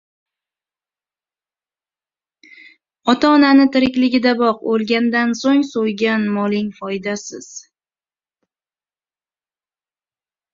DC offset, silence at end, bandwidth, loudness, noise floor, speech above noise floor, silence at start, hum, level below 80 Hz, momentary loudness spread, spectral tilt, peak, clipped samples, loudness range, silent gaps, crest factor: under 0.1%; 2.95 s; 7.6 kHz; -16 LUFS; under -90 dBFS; over 74 dB; 3.05 s; none; -60 dBFS; 14 LU; -5 dB/octave; -2 dBFS; under 0.1%; 13 LU; none; 18 dB